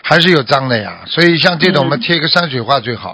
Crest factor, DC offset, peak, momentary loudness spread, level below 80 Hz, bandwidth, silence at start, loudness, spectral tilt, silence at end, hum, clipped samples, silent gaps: 12 dB; under 0.1%; 0 dBFS; 7 LU; -50 dBFS; 8 kHz; 0.05 s; -12 LUFS; -5.5 dB/octave; 0 s; none; 0.5%; none